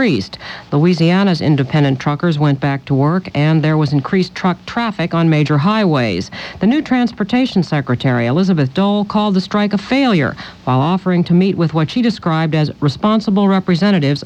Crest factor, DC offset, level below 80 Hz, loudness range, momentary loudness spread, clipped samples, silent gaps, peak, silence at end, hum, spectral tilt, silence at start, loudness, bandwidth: 12 dB; under 0.1%; -48 dBFS; 1 LU; 5 LU; under 0.1%; none; -2 dBFS; 0 s; none; -7.5 dB/octave; 0 s; -15 LUFS; 8.6 kHz